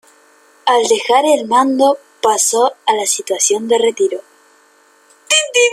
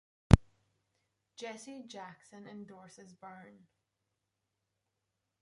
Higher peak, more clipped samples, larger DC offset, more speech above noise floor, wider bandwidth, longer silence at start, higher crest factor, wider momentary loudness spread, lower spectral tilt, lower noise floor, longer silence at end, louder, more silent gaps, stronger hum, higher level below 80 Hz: about the same, 0 dBFS vs -2 dBFS; neither; neither; about the same, 37 dB vs 36 dB; first, 15 kHz vs 11.5 kHz; first, 0.65 s vs 0.3 s; second, 16 dB vs 34 dB; second, 5 LU vs 27 LU; second, -0.5 dB/octave vs -7 dB/octave; second, -51 dBFS vs -86 dBFS; second, 0 s vs 3.9 s; first, -14 LUFS vs -29 LUFS; neither; neither; second, -68 dBFS vs -44 dBFS